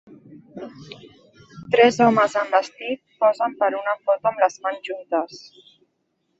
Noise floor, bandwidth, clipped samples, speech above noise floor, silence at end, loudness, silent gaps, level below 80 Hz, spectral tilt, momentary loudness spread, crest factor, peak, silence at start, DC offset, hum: -71 dBFS; 8.2 kHz; under 0.1%; 51 dB; 1 s; -21 LUFS; none; -66 dBFS; -5 dB/octave; 22 LU; 20 dB; -2 dBFS; 0.3 s; under 0.1%; none